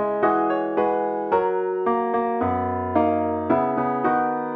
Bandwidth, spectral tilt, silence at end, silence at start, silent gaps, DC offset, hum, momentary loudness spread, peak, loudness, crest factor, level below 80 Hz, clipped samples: 4.9 kHz; -10 dB/octave; 0 s; 0 s; none; under 0.1%; none; 3 LU; -6 dBFS; -22 LUFS; 16 dB; -58 dBFS; under 0.1%